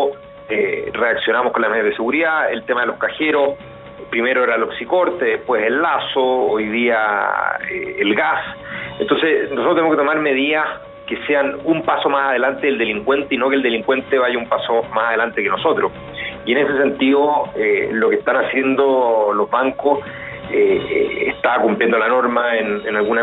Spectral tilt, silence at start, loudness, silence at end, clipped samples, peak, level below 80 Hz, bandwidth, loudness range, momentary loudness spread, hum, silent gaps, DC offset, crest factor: -7 dB/octave; 0 s; -17 LUFS; 0 s; under 0.1%; -2 dBFS; -54 dBFS; 4.1 kHz; 2 LU; 7 LU; none; none; under 0.1%; 16 dB